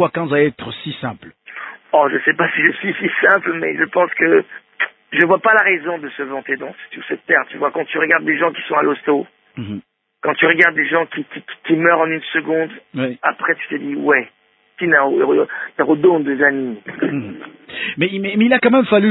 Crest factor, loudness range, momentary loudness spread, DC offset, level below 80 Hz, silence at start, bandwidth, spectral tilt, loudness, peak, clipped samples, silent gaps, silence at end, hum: 18 dB; 3 LU; 16 LU; under 0.1%; -62 dBFS; 0 s; 4.1 kHz; -8 dB/octave; -16 LUFS; 0 dBFS; under 0.1%; none; 0 s; none